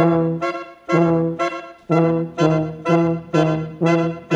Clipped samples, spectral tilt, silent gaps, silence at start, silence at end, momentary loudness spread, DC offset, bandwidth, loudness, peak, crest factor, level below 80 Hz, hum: under 0.1%; -7.5 dB/octave; none; 0 s; 0 s; 7 LU; under 0.1%; 8 kHz; -19 LUFS; -2 dBFS; 16 dB; -54 dBFS; none